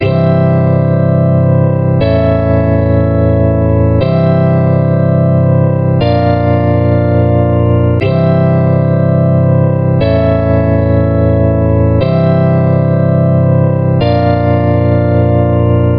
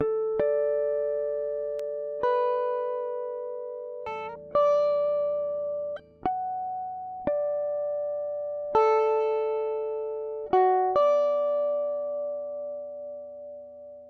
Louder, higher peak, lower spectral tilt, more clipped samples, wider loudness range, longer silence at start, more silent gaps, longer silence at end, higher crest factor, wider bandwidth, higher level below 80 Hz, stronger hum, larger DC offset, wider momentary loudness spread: first, -10 LUFS vs -28 LUFS; first, 0 dBFS vs -12 dBFS; first, -12 dB/octave vs -6.5 dB/octave; neither; second, 0 LU vs 5 LU; about the same, 0 s vs 0 s; neither; about the same, 0 s vs 0 s; second, 8 dB vs 16 dB; second, 5.2 kHz vs 6.2 kHz; first, -30 dBFS vs -64 dBFS; neither; neither; second, 1 LU vs 14 LU